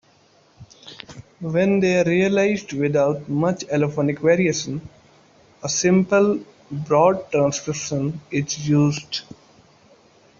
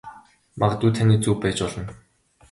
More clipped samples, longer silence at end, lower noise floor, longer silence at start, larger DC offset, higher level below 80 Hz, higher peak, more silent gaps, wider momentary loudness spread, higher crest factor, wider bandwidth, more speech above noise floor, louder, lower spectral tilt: neither; first, 1.2 s vs 0.6 s; first, -56 dBFS vs -45 dBFS; first, 0.6 s vs 0.05 s; neither; second, -58 dBFS vs -46 dBFS; about the same, -4 dBFS vs -4 dBFS; neither; about the same, 15 LU vs 13 LU; about the same, 18 dB vs 18 dB; second, 7.6 kHz vs 11.5 kHz; first, 36 dB vs 25 dB; about the same, -20 LUFS vs -22 LUFS; about the same, -5.5 dB/octave vs -6 dB/octave